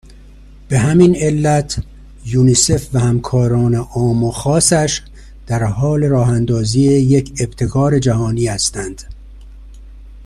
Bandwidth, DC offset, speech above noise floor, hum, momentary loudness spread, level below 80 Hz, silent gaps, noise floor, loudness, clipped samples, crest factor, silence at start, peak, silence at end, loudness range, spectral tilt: 12.5 kHz; under 0.1%; 25 dB; 50 Hz at -35 dBFS; 11 LU; -34 dBFS; none; -39 dBFS; -14 LUFS; under 0.1%; 14 dB; 0.1 s; 0 dBFS; 0 s; 2 LU; -5.5 dB/octave